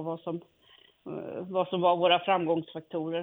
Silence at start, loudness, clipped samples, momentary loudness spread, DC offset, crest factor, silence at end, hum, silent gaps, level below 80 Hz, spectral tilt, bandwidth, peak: 0 s; -28 LUFS; under 0.1%; 16 LU; under 0.1%; 20 dB; 0 s; none; none; -76 dBFS; -8.5 dB/octave; 4 kHz; -10 dBFS